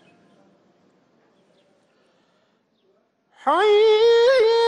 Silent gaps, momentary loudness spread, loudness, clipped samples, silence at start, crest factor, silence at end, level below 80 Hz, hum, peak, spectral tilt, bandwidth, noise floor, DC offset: none; 7 LU; -17 LUFS; under 0.1%; 3.45 s; 12 dB; 0 s; -68 dBFS; none; -10 dBFS; -2 dB/octave; 9.4 kHz; -65 dBFS; under 0.1%